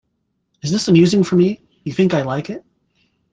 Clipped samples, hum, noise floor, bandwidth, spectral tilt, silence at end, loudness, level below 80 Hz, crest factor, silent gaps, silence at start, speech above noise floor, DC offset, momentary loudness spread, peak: under 0.1%; none; -70 dBFS; 9.4 kHz; -6.5 dB/octave; 0.75 s; -16 LUFS; -56 dBFS; 16 dB; none; 0.65 s; 55 dB; under 0.1%; 16 LU; -2 dBFS